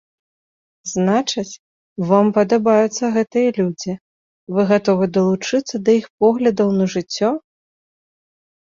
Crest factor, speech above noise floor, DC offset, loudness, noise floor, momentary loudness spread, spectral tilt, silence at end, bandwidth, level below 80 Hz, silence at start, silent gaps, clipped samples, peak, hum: 18 dB; over 73 dB; under 0.1%; -18 LUFS; under -90 dBFS; 12 LU; -5.5 dB/octave; 1.25 s; 7.6 kHz; -60 dBFS; 0.85 s; 1.59-1.96 s, 4.01-4.47 s, 6.10-6.18 s; under 0.1%; -2 dBFS; none